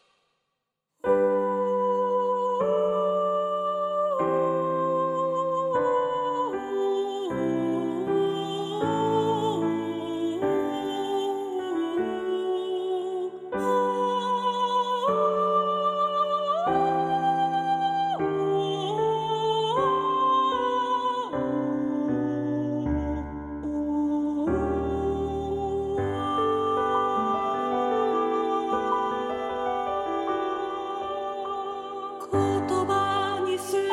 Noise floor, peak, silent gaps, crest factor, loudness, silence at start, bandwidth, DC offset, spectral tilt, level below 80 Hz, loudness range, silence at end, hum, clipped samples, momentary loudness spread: -81 dBFS; -12 dBFS; none; 14 dB; -26 LUFS; 1.05 s; 13.5 kHz; under 0.1%; -6 dB/octave; -50 dBFS; 4 LU; 0 s; none; under 0.1%; 6 LU